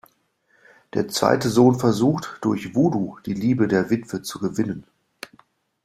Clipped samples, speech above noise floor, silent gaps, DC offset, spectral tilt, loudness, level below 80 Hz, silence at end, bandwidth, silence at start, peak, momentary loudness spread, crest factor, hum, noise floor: under 0.1%; 44 dB; none; under 0.1%; -6 dB/octave; -22 LUFS; -58 dBFS; 1.05 s; 15 kHz; 0.95 s; -2 dBFS; 16 LU; 20 dB; none; -65 dBFS